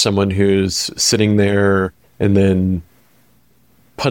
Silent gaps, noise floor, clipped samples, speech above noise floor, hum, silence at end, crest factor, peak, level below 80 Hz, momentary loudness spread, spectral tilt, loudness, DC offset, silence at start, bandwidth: none; -56 dBFS; under 0.1%; 41 dB; none; 0 s; 14 dB; -2 dBFS; -44 dBFS; 7 LU; -5 dB/octave; -16 LUFS; 0.2%; 0 s; 17 kHz